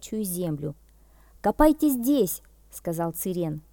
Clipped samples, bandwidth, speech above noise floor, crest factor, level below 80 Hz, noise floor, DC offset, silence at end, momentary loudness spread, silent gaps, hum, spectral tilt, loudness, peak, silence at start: under 0.1%; 19 kHz; 30 dB; 20 dB; -42 dBFS; -55 dBFS; under 0.1%; 0.15 s; 15 LU; none; none; -6 dB/octave; -26 LUFS; -6 dBFS; 0 s